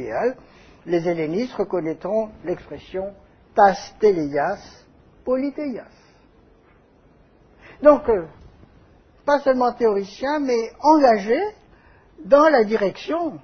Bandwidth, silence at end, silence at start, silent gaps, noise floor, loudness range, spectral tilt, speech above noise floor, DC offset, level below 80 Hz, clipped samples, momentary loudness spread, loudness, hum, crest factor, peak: 6.6 kHz; 0.05 s; 0 s; none; -54 dBFS; 7 LU; -6 dB/octave; 35 dB; under 0.1%; -52 dBFS; under 0.1%; 15 LU; -20 LUFS; none; 20 dB; 0 dBFS